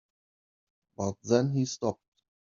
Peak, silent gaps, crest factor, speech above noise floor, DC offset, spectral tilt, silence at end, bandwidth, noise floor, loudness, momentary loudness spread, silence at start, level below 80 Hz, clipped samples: -10 dBFS; none; 22 dB; over 62 dB; under 0.1%; -7 dB/octave; 0.6 s; 7.4 kHz; under -90 dBFS; -30 LUFS; 9 LU; 1 s; -70 dBFS; under 0.1%